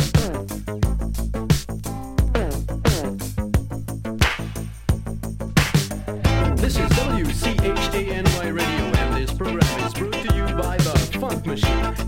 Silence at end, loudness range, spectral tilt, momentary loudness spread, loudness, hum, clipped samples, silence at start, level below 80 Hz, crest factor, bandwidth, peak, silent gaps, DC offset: 0 s; 3 LU; -5.5 dB/octave; 8 LU; -22 LUFS; none; under 0.1%; 0 s; -26 dBFS; 20 dB; 16.5 kHz; -2 dBFS; none; under 0.1%